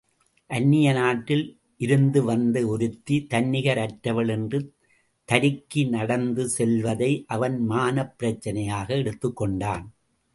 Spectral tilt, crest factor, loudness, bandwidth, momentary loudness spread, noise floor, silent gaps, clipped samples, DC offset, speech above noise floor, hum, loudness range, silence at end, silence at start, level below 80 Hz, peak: -6 dB/octave; 22 dB; -24 LUFS; 11.5 kHz; 8 LU; -66 dBFS; none; under 0.1%; under 0.1%; 42 dB; none; 3 LU; 0.45 s; 0.5 s; -54 dBFS; -2 dBFS